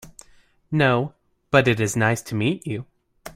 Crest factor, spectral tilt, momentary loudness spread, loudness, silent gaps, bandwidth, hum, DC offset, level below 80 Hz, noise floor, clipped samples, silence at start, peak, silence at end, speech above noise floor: 20 dB; -5.5 dB/octave; 13 LU; -22 LUFS; none; 16 kHz; none; under 0.1%; -54 dBFS; -55 dBFS; under 0.1%; 0.05 s; -2 dBFS; 0.05 s; 35 dB